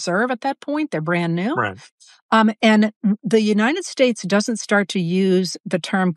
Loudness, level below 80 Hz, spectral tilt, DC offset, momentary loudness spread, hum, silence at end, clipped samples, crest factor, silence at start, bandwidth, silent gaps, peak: -19 LUFS; -76 dBFS; -5.5 dB/octave; under 0.1%; 8 LU; none; 0 s; under 0.1%; 16 dB; 0 s; 12 kHz; 1.92-1.98 s, 2.22-2.29 s, 2.96-3.01 s, 5.60-5.64 s; -2 dBFS